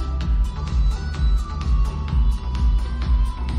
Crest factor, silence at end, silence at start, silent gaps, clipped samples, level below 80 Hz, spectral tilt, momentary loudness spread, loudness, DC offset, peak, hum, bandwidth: 10 dB; 0 s; 0 s; none; under 0.1%; -20 dBFS; -7 dB/octave; 2 LU; -23 LUFS; under 0.1%; -10 dBFS; none; 7.6 kHz